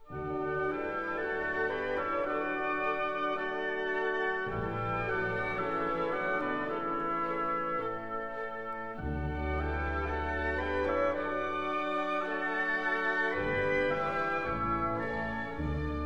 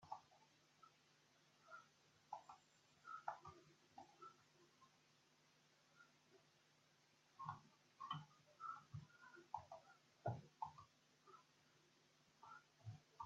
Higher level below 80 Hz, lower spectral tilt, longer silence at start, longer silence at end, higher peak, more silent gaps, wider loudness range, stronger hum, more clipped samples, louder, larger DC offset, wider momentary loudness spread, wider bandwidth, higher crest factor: first, -46 dBFS vs under -90 dBFS; first, -7 dB/octave vs -4.5 dB/octave; about the same, 0.05 s vs 0 s; about the same, 0 s vs 0 s; first, -18 dBFS vs -32 dBFS; neither; second, 4 LU vs 8 LU; neither; neither; first, -32 LUFS vs -58 LUFS; first, 0.4% vs under 0.1%; second, 6 LU vs 15 LU; first, 8.8 kHz vs 7.6 kHz; second, 14 dB vs 28 dB